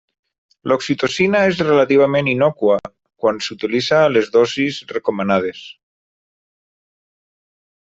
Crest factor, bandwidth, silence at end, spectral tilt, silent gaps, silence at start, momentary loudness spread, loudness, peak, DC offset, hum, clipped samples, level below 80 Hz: 16 dB; 8 kHz; 2.1 s; -5.5 dB/octave; none; 0.65 s; 8 LU; -17 LUFS; -2 dBFS; under 0.1%; none; under 0.1%; -58 dBFS